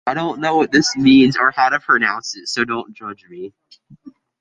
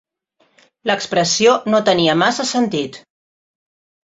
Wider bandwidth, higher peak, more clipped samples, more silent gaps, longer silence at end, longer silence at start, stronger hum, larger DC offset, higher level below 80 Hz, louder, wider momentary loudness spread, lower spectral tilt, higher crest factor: first, 9.2 kHz vs 8 kHz; about the same, -2 dBFS vs -2 dBFS; neither; neither; second, 0.3 s vs 1.2 s; second, 0.05 s vs 0.85 s; neither; neither; first, -54 dBFS vs -60 dBFS; about the same, -16 LUFS vs -16 LUFS; first, 22 LU vs 10 LU; about the same, -4 dB/octave vs -3.5 dB/octave; about the same, 16 dB vs 18 dB